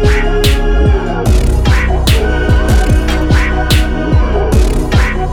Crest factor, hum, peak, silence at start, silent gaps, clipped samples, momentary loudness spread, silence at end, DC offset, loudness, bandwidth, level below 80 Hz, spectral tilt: 10 dB; none; 0 dBFS; 0 s; none; under 0.1%; 1 LU; 0 s; under 0.1%; -12 LUFS; 17.5 kHz; -12 dBFS; -6 dB/octave